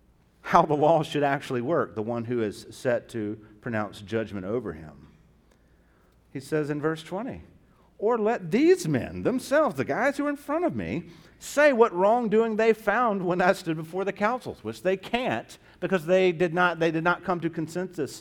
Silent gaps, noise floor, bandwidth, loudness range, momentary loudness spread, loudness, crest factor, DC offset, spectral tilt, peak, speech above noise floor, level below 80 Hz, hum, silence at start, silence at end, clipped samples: none; -60 dBFS; 17.5 kHz; 10 LU; 12 LU; -26 LUFS; 22 dB; under 0.1%; -6 dB/octave; -4 dBFS; 35 dB; -58 dBFS; none; 0.45 s; 0 s; under 0.1%